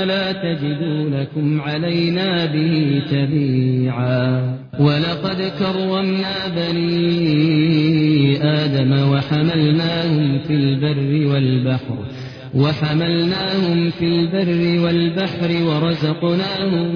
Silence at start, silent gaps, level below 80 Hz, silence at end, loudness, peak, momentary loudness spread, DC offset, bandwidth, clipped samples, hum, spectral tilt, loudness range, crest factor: 0 s; none; -50 dBFS; 0 s; -18 LUFS; -4 dBFS; 6 LU; under 0.1%; 5.4 kHz; under 0.1%; none; -8.5 dB/octave; 3 LU; 14 dB